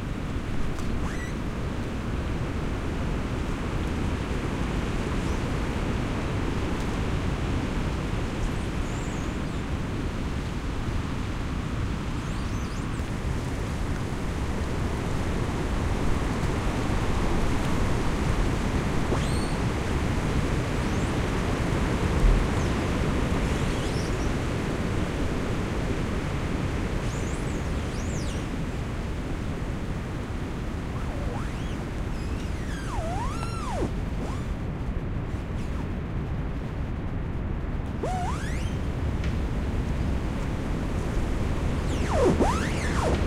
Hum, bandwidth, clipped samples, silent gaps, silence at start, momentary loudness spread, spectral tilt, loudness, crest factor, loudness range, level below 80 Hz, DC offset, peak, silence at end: none; 15 kHz; under 0.1%; none; 0 s; 6 LU; -6 dB/octave; -29 LUFS; 18 dB; 5 LU; -32 dBFS; under 0.1%; -10 dBFS; 0 s